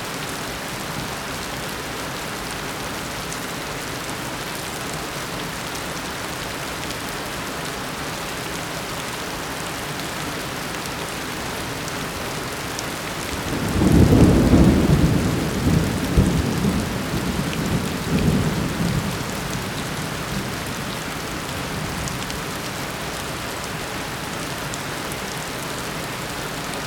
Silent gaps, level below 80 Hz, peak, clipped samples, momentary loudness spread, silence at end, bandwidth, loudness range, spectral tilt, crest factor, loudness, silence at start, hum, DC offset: none; -34 dBFS; -2 dBFS; under 0.1%; 9 LU; 0 s; 19 kHz; 10 LU; -5 dB/octave; 22 dB; -24 LUFS; 0 s; none; under 0.1%